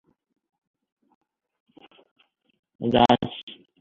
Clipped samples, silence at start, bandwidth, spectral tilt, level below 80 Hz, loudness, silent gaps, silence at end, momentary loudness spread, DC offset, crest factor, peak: under 0.1%; 2.8 s; 7.4 kHz; -7 dB/octave; -56 dBFS; -22 LUFS; 3.43-3.47 s; 0.3 s; 21 LU; under 0.1%; 24 dB; -4 dBFS